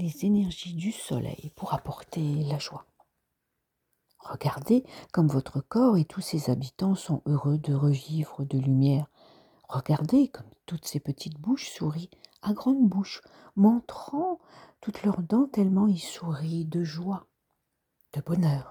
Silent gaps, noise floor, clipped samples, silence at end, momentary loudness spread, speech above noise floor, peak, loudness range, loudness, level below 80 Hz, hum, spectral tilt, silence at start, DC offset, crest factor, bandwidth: none; -81 dBFS; under 0.1%; 0 s; 14 LU; 54 dB; -12 dBFS; 5 LU; -28 LUFS; -62 dBFS; none; -7.5 dB/octave; 0 s; under 0.1%; 16 dB; over 20 kHz